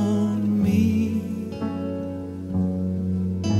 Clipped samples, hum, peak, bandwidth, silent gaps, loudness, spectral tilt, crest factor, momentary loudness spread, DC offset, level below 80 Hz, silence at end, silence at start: under 0.1%; none; -10 dBFS; 13.5 kHz; none; -25 LUFS; -8 dB/octave; 14 dB; 10 LU; under 0.1%; -50 dBFS; 0 s; 0 s